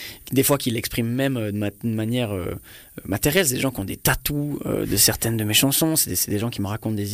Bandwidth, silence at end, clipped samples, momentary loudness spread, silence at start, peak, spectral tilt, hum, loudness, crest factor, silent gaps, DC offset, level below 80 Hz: 15.5 kHz; 0 s; under 0.1%; 10 LU; 0 s; -6 dBFS; -3.5 dB/octave; none; -21 LUFS; 16 dB; none; under 0.1%; -44 dBFS